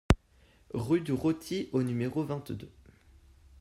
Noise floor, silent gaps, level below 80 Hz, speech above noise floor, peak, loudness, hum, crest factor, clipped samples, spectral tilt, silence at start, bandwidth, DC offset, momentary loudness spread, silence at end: -63 dBFS; none; -42 dBFS; 31 dB; -6 dBFS; -32 LUFS; none; 26 dB; under 0.1%; -7 dB/octave; 0.1 s; 15.5 kHz; under 0.1%; 12 LU; 0.95 s